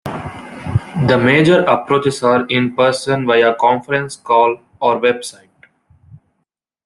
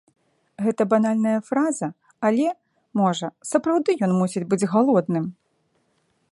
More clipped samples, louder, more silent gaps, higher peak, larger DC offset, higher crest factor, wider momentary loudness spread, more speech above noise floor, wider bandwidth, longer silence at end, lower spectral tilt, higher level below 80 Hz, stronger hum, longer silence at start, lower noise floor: neither; first, -14 LUFS vs -22 LUFS; neither; about the same, -2 dBFS vs -4 dBFS; neither; about the same, 14 dB vs 18 dB; first, 12 LU vs 9 LU; first, 58 dB vs 47 dB; about the same, 12.5 kHz vs 11.5 kHz; first, 1.55 s vs 1 s; about the same, -6 dB/octave vs -6.5 dB/octave; first, -48 dBFS vs -72 dBFS; neither; second, 0.05 s vs 0.6 s; first, -72 dBFS vs -68 dBFS